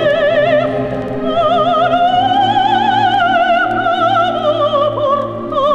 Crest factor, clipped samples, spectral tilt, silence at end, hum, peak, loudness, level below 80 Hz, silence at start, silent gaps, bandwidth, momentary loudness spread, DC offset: 10 dB; under 0.1%; -6 dB/octave; 0 s; none; -2 dBFS; -13 LUFS; -44 dBFS; 0 s; none; 8.8 kHz; 5 LU; under 0.1%